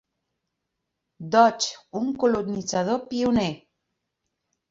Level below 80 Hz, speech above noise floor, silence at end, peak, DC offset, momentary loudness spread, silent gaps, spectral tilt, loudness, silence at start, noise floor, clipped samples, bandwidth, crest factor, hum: -58 dBFS; 58 dB; 1.15 s; -4 dBFS; under 0.1%; 11 LU; none; -4.5 dB/octave; -24 LUFS; 1.2 s; -81 dBFS; under 0.1%; 7.8 kHz; 22 dB; none